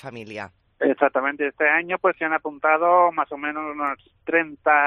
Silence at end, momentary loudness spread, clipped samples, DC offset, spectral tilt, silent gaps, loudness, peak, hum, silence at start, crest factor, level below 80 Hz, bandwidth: 0 s; 16 LU; under 0.1%; under 0.1%; -6.5 dB/octave; none; -21 LUFS; -2 dBFS; none; 0.05 s; 20 dB; -66 dBFS; 6.4 kHz